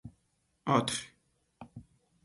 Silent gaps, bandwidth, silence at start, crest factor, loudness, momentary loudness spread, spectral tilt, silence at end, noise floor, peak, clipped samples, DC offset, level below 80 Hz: none; 11.5 kHz; 0.05 s; 24 dB; -32 LUFS; 25 LU; -4.5 dB/octave; 0.45 s; -76 dBFS; -12 dBFS; under 0.1%; under 0.1%; -66 dBFS